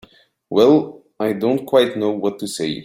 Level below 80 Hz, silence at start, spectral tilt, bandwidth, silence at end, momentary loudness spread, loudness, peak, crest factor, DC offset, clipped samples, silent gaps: -60 dBFS; 0.5 s; -5.5 dB/octave; 15.5 kHz; 0 s; 11 LU; -18 LUFS; 0 dBFS; 18 dB; under 0.1%; under 0.1%; none